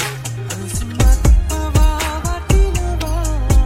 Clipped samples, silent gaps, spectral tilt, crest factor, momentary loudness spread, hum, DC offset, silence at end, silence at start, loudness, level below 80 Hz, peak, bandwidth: under 0.1%; none; -5 dB/octave; 12 dB; 9 LU; none; under 0.1%; 0 s; 0 s; -18 LUFS; -16 dBFS; -2 dBFS; 16 kHz